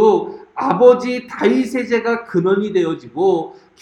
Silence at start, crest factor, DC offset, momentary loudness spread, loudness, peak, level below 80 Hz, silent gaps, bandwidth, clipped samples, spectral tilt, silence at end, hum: 0 s; 16 dB; under 0.1%; 11 LU; -17 LUFS; 0 dBFS; -62 dBFS; none; 11.5 kHz; under 0.1%; -6.5 dB/octave; 0.3 s; none